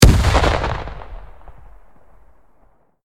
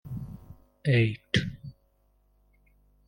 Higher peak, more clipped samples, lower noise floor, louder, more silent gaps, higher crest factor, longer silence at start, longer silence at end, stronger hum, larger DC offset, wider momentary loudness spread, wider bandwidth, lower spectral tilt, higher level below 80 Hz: first, 0 dBFS vs -10 dBFS; neither; second, -56 dBFS vs -67 dBFS; first, -17 LUFS vs -28 LUFS; neither; about the same, 18 dB vs 22 dB; about the same, 0 s vs 0.05 s; first, 1.8 s vs 1.35 s; second, none vs 50 Hz at -50 dBFS; neither; about the same, 25 LU vs 23 LU; first, 16.5 kHz vs 10.5 kHz; second, -5 dB/octave vs -6.5 dB/octave; first, -22 dBFS vs -54 dBFS